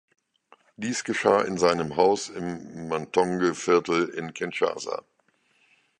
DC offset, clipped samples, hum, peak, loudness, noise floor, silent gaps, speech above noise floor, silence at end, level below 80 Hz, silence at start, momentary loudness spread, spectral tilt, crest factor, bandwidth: under 0.1%; under 0.1%; none; -4 dBFS; -25 LUFS; -67 dBFS; none; 42 dB; 1 s; -62 dBFS; 0.8 s; 12 LU; -4.5 dB/octave; 22 dB; 10 kHz